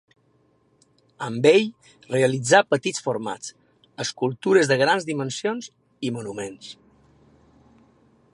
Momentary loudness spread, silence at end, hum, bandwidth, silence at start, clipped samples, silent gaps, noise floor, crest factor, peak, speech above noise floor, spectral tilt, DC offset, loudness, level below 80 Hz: 17 LU; 1.6 s; none; 11.5 kHz; 1.2 s; under 0.1%; none; -63 dBFS; 22 dB; -2 dBFS; 41 dB; -4.5 dB/octave; under 0.1%; -22 LUFS; -68 dBFS